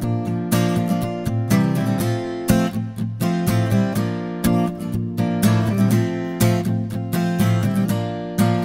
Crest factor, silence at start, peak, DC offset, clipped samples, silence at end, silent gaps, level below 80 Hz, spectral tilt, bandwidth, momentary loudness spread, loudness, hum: 18 dB; 0 s; -2 dBFS; under 0.1%; under 0.1%; 0 s; none; -44 dBFS; -6.5 dB/octave; 16.5 kHz; 6 LU; -20 LUFS; none